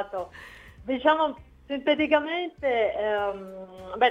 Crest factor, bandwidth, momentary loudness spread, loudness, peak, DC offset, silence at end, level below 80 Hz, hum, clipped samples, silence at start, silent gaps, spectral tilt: 20 dB; 7.6 kHz; 19 LU; -26 LUFS; -8 dBFS; under 0.1%; 0 s; -56 dBFS; none; under 0.1%; 0 s; none; -5.5 dB/octave